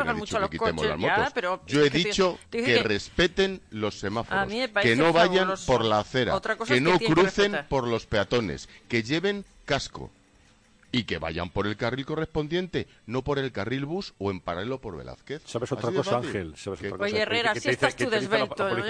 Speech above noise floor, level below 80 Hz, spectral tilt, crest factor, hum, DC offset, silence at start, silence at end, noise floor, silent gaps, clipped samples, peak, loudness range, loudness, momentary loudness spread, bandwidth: 33 dB; -50 dBFS; -5 dB/octave; 20 dB; none; under 0.1%; 0 s; 0 s; -59 dBFS; none; under 0.1%; -6 dBFS; 8 LU; -26 LUFS; 11 LU; 10.5 kHz